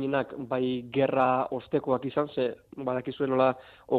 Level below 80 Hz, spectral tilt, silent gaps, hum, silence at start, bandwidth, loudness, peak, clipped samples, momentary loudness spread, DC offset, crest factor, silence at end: -66 dBFS; -8.5 dB/octave; none; none; 0 s; 4.7 kHz; -28 LUFS; -12 dBFS; under 0.1%; 8 LU; under 0.1%; 16 dB; 0 s